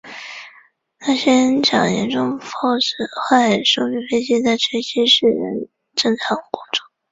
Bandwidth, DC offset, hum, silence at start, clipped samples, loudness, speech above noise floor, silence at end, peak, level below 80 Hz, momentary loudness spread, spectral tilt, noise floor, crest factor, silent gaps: 8 kHz; under 0.1%; none; 0.05 s; under 0.1%; -17 LUFS; 34 dB; 0.3 s; -2 dBFS; -60 dBFS; 11 LU; -3.5 dB/octave; -52 dBFS; 18 dB; none